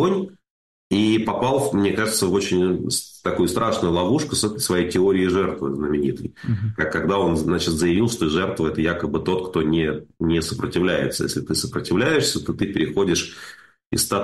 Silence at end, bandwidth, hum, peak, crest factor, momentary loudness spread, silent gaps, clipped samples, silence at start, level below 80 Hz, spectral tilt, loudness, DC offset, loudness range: 0 s; 12.5 kHz; none; -10 dBFS; 12 dB; 6 LU; 0.50-0.90 s, 13.86-13.90 s; under 0.1%; 0 s; -46 dBFS; -4.5 dB/octave; -21 LUFS; under 0.1%; 2 LU